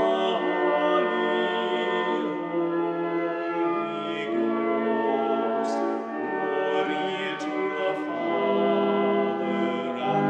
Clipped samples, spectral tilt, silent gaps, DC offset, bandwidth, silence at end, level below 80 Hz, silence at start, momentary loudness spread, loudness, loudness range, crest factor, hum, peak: under 0.1%; -6 dB/octave; none; under 0.1%; 8.4 kHz; 0 s; -76 dBFS; 0 s; 5 LU; -26 LUFS; 2 LU; 14 dB; none; -10 dBFS